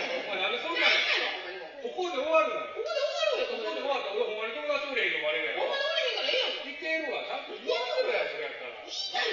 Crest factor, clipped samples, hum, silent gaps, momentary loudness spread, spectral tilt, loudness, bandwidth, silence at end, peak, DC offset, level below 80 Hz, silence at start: 20 dB; under 0.1%; none; none; 10 LU; 2.5 dB/octave; -29 LUFS; 7.4 kHz; 0 s; -12 dBFS; under 0.1%; -76 dBFS; 0 s